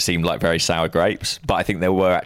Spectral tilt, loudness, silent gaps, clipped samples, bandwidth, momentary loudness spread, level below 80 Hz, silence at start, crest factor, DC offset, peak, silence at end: -4 dB/octave; -20 LUFS; none; under 0.1%; 16.5 kHz; 3 LU; -40 dBFS; 0 s; 14 dB; under 0.1%; -6 dBFS; 0 s